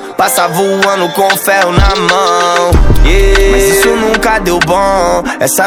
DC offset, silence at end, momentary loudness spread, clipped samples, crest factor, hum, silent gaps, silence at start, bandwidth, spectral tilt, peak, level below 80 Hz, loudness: under 0.1%; 0 s; 3 LU; 1%; 8 dB; none; none; 0 s; 18 kHz; -4 dB/octave; 0 dBFS; -14 dBFS; -9 LUFS